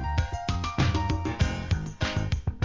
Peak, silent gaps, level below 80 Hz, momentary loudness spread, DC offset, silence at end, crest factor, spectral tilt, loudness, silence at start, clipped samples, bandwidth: -12 dBFS; none; -32 dBFS; 4 LU; 0.2%; 0 s; 16 dB; -6 dB/octave; -29 LUFS; 0 s; under 0.1%; 7.6 kHz